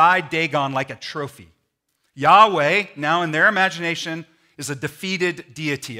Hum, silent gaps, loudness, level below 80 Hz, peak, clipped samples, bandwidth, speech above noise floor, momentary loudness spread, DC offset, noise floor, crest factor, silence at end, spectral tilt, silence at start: none; none; -19 LUFS; -68 dBFS; 0 dBFS; under 0.1%; 16 kHz; 52 dB; 16 LU; under 0.1%; -72 dBFS; 20 dB; 0 s; -4 dB/octave; 0 s